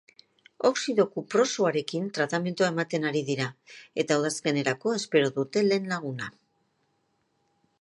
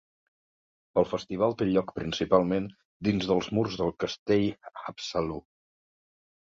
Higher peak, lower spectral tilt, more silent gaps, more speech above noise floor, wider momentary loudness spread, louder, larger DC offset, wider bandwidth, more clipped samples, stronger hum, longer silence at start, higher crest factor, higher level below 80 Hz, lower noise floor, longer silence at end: about the same, -8 dBFS vs -8 dBFS; second, -4.5 dB/octave vs -6.5 dB/octave; second, none vs 2.85-3.00 s, 4.19-4.26 s; second, 46 dB vs over 62 dB; second, 7 LU vs 11 LU; about the same, -27 LUFS vs -28 LUFS; neither; first, 11.5 kHz vs 7.6 kHz; neither; neither; second, 0.6 s vs 0.95 s; about the same, 20 dB vs 22 dB; second, -76 dBFS vs -56 dBFS; second, -73 dBFS vs under -90 dBFS; first, 1.5 s vs 1.1 s